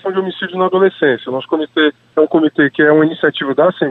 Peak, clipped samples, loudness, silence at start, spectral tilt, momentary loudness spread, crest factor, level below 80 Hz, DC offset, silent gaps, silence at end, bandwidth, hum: 0 dBFS; under 0.1%; -14 LUFS; 0.05 s; -8 dB/octave; 8 LU; 12 dB; -60 dBFS; under 0.1%; none; 0 s; 4.1 kHz; none